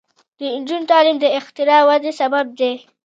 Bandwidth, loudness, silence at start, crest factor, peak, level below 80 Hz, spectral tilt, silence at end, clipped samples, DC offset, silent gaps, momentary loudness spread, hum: 7.8 kHz; -16 LUFS; 0.4 s; 16 dB; 0 dBFS; -78 dBFS; -3 dB/octave; 0.25 s; under 0.1%; under 0.1%; none; 11 LU; none